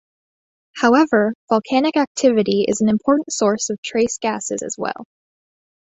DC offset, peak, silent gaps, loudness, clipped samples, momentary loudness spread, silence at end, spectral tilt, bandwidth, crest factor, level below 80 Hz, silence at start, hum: under 0.1%; -2 dBFS; 1.35-1.48 s, 2.07-2.15 s, 3.78-3.83 s; -18 LUFS; under 0.1%; 10 LU; 0.8 s; -4 dB/octave; 8.4 kHz; 18 dB; -58 dBFS; 0.75 s; none